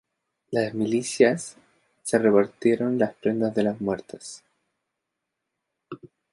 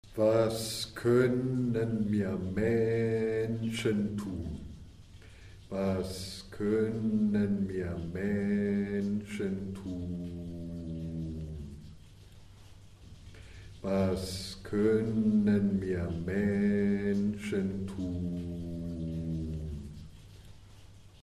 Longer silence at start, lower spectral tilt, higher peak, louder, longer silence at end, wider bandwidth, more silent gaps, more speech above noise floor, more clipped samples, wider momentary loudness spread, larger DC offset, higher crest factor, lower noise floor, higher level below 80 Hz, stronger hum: first, 0.5 s vs 0.05 s; second, -5.5 dB/octave vs -7 dB/octave; first, -4 dBFS vs -14 dBFS; first, -24 LUFS vs -32 LUFS; first, 0.25 s vs 0.05 s; second, 11.5 kHz vs 14 kHz; neither; first, 59 dB vs 22 dB; neither; first, 22 LU vs 14 LU; neither; about the same, 22 dB vs 18 dB; first, -83 dBFS vs -53 dBFS; second, -66 dBFS vs -52 dBFS; neither